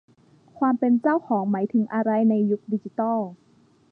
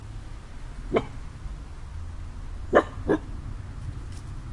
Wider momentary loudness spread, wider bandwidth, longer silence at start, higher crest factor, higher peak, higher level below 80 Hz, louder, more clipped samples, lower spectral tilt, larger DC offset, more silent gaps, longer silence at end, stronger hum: second, 7 LU vs 18 LU; second, 3.1 kHz vs 11.5 kHz; first, 0.55 s vs 0 s; second, 14 dB vs 26 dB; second, -10 dBFS vs -4 dBFS; second, -76 dBFS vs -38 dBFS; first, -23 LUFS vs -30 LUFS; neither; first, -11 dB/octave vs -7 dB/octave; neither; neither; first, 0.55 s vs 0 s; neither